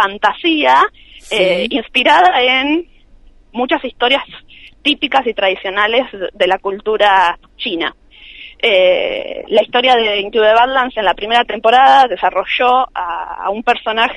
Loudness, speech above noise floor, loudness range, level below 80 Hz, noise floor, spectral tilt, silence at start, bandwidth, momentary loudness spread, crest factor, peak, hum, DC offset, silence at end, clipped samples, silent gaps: -13 LUFS; 30 dB; 4 LU; -46 dBFS; -43 dBFS; -3.5 dB/octave; 0 s; 11.5 kHz; 11 LU; 14 dB; 0 dBFS; none; under 0.1%; 0 s; under 0.1%; none